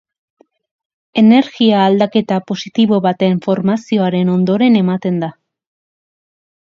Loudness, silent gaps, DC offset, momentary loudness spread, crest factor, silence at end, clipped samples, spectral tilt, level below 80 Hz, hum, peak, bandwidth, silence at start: -14 LUFS; none; under 0.1%; 9 LU; 14 dB; 1.45 s; under 0.1%; -7.5 dB/octave; -62 dBFS; none; 0 dBFS; 7 kHz; 1.15 s